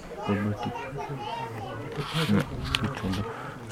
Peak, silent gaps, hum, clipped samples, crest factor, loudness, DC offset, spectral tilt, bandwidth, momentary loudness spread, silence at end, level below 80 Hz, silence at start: -4 dBFS; none; none; under 0.1%; 26 dB; -30 LUFS; under 0.1%; -5.5 dB/octave; 16 kHz; 10 LU; 0 s; -46 dBFS; 0 s